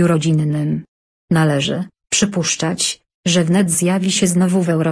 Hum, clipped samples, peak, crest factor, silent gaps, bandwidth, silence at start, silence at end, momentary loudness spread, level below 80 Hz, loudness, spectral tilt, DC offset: none; under 0.1%; -4 dBFS; 14 dB; 0.88-1.28 s, 3.14-3.23 s; 11 kHz; 0 s; 0 s; 6 LU; -52 dBFS; -17 LUFS; -4.5 dB/octave; under 0.1%